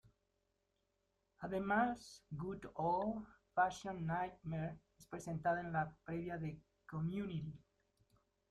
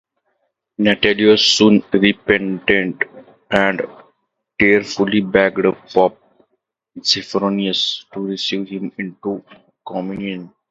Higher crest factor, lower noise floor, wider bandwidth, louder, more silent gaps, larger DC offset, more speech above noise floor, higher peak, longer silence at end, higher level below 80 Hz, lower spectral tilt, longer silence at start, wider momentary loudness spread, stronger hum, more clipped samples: about the same, 20 dB vs 18 dB; first, -84 dBFS vs -71 dBFS; first, 12.5 kHz vs 8 kHz; second, -42 LUFS vs -17 LUFS; neither; neither; second, 43 dB vs 54 dB; second, -22 dBFS vs 0 dBFS; first, 0.95 s vs 0.2 s; second, -68 dBFS vs -54 dBFS; first, -7 dB/octave vs -4.5 dB/octave; first, 1.4 s vs 0.8 s; about the same, 14 LU vs 14 LU; neither; neither